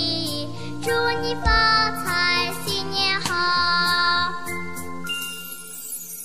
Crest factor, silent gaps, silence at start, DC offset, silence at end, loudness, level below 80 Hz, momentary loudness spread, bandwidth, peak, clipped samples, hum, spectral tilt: 16 dB; none; 0 s; 2%; 0 s; -21 LUFS; -38 dBFS; 13 LU; 15.5 kHz; -6 dBFS; under 0.1%; none; -2.5 dB/octave